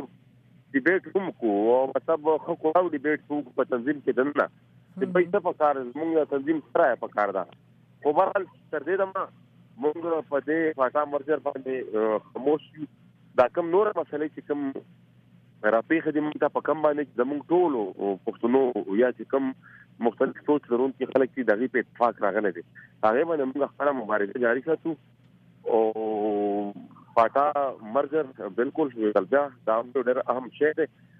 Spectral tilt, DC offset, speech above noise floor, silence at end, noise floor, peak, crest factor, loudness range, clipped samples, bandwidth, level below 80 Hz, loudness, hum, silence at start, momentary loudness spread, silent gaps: -8.5 dB/octave; under 0.1%; 31 dB; 0.35 s; -57 dBFS; -8 dBFS; 18 dB; 2 LU; under 0.1%; 4.9 kHz; -74 dBFS; -26 LUFS; none; 0 s; 8 LU; none